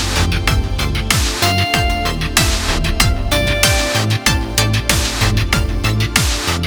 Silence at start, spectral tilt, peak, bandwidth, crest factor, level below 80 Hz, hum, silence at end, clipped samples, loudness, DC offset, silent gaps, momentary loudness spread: 0 s; -3.5 dB/octave; 0 dBFS; over 20 kHz; 16 dB; -22 dBFS; none; 0 s; under 0.1%; -15 LUFS; under 0.1%; none; 4 LU